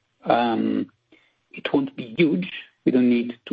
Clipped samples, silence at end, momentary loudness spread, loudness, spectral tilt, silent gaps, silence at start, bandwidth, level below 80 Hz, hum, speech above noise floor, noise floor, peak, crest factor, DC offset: under 0.1%; 0.05 s; 13 LU; -23 LUFS; -9 dB/octave; none; 0.25 s; 5 kHz; -66 dBFS; none; 38 dB; -60 dBFS; -6 dBFS; 16 dB; under 0.1%